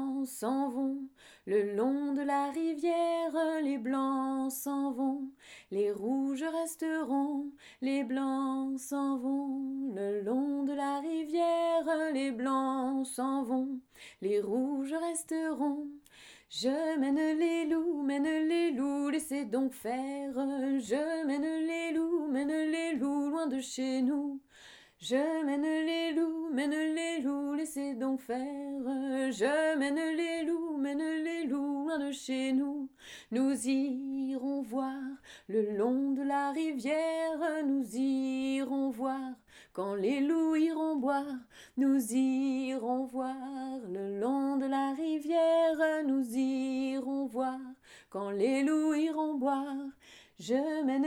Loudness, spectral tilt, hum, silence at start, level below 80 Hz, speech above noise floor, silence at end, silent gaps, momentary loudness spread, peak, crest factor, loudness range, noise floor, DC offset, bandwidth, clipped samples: -33 LUFS; -4 dB/octave; none; 0 s; -76 dBFS; 25 dB; 0 s; none; 8 LU; -18 dBFS; 14 dB; 3 LU; -57 dBFS; under 0.1%; 16.5 kHz; under 0.1%